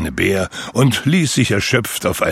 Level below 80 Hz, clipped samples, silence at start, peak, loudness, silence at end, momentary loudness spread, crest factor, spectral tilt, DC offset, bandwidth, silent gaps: -40 dBFS; under 0.1%; 0 s; -2 dBFS; -16 LUFS; 0 s; 5 LU; 16 dB; -4.5 dB/octave; under 0.1%; 16.5 kHz; none